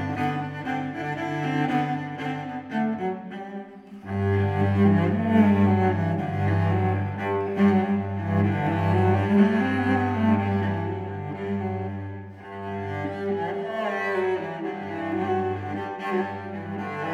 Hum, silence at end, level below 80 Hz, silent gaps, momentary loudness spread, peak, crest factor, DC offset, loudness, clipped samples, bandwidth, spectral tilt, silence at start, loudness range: none; 0 s; -62 dBFS; none; 13 LU; -8 dBFS; 16 dB; under 0.1%; -25 LUFS; under 0.1%; 6.8 kHz; -9 dB/octave; 0 s; 7 LU